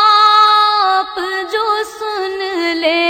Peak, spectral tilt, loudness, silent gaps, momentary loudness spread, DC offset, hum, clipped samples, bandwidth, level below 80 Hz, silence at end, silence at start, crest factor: 0 dBFS; -1 dB/octave; -13 LUFS; none; 12 LU; under 0.1%; none; under 0.1%; 16.5 kHz; -56 dBFS; 0 s; 0 s; 14 dB